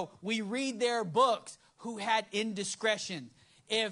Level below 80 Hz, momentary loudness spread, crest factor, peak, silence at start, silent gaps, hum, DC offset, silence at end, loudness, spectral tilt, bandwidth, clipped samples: -80 dBFS; 14 LU; 18 dB; -16 dBFS; 0 s; none; none; under 0.1%; 0 s; -32 LUFS; -3 dB/octave; 11.5 kHz; under 0.1%